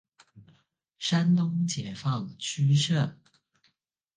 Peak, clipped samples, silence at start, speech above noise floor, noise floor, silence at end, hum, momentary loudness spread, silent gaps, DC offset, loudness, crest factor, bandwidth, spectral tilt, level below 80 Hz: -14 dBFS; under 0.1%; 0.35 s; 49 dB; -75 dBFS; 1.05 s; none; 9 LU; none; under 0.1%; -27 LUFS; 14 dB; 9.8 kHz; -5.5 dB/octave; -70 dBFS